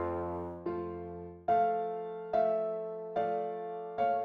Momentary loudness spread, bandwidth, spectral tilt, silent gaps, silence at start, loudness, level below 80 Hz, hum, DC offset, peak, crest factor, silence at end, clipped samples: 10 LU; 5 kHz; -9 dB/octave; none; 0 s; -34 LUFS; -64 dBFS; none; under 0.1%; -20 dBFS; 14 dB; 0 s; under 0.1%